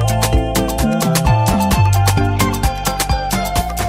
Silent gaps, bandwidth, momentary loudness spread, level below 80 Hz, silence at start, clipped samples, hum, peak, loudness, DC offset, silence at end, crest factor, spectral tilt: none; 16.5 kHz; 5 LU; -22 dBFS; 0 s; under 0.1%; none; -2 dBFS; -16 LUFS; under 0.1%; 0 s; 14 dB; -5 dB/octave